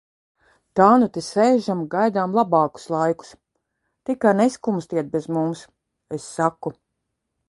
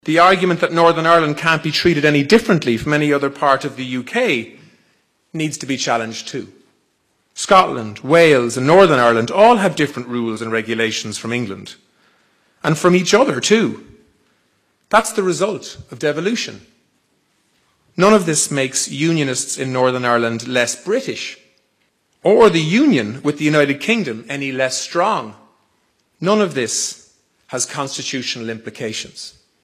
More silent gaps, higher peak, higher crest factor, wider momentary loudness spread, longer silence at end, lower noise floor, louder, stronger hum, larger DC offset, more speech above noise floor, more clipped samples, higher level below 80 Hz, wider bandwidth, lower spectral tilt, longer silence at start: neither; about the same, 0 dBFS vs 0 dBFS; first, 22 dB vs 16 dB; about the same, 15 LU vs 15 LU; first, 0.75 s vs 0.35 s; first, -78 dBFS vs -64 dBFS; second, -21 LUFS vs -16 LUFS; neither; neither; first, 58 dB vs 48 dB; neither; second, -64 dBFS vs -54 dBFS; second, 11.5 kHz vs 15 kHz; first, -6.5 dB/octave vs -4 dB/octave; first, 0.75 s vs 0.05 s